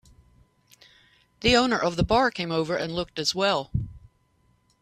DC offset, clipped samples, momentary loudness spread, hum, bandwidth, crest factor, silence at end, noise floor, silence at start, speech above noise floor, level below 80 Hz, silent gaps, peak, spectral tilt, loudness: under 0.1%; under 0.1%; 10 LU; none; 14 kHz; 20 dB; 0.85 s; -66 dBFS; 1.4 s; 42 dB; -44 dBFS; none; -6 dBFS; -4.5 dB/octave; -24 LUFS